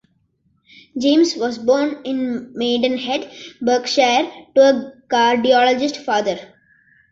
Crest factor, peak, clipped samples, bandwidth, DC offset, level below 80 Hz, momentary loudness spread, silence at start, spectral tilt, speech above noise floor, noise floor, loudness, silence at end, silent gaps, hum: 16 dB; -2 dBFS; under 0.1%; 7.8 kHz; under 0.1%; -62 dBFS; 10 LU; 0.95 s; -3 dB/octave; 46 dB; -63 dBFS; -18 LUFS; 0.65 s; none; none